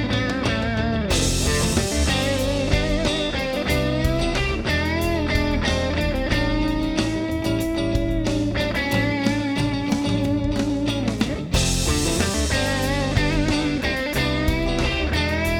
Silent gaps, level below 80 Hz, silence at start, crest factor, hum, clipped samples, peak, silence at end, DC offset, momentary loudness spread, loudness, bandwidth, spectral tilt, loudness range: none; -28 dBFS; 0 s; 18 dB; none; under 0.1%; -4 dBFS; 0 s; under 0.1%; 3 LU; -22 LUFS; 19.5 kHz; -4.5 dB/octave; 1 LU